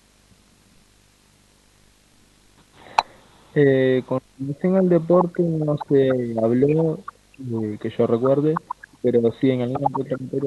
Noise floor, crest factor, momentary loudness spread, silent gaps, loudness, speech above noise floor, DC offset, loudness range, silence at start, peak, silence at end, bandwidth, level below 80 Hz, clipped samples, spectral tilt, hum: -56 dBFS; 18 dB; 11 LU; none; -21 LUFS; 37 dB; under 0.1%; 7 LU; 3 s; -4 dBFS; 0 s; 11.5 kHz; -60 dBFS; under 0.1%; -8.5 dB/octave; 50 Hz at -50 dBFS